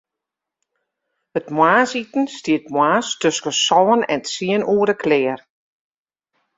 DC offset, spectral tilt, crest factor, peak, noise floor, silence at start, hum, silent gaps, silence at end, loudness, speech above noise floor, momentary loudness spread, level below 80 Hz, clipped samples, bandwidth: under 0.1%; -3.5 dB/octave; 18 dB; -2 dBFS; -84 dBFS; 1.35 s; none; none; 1.2 s; -18 LUFS; 66 dB; 9 LU; -64 dBFS; under 0.1%; 8 kHz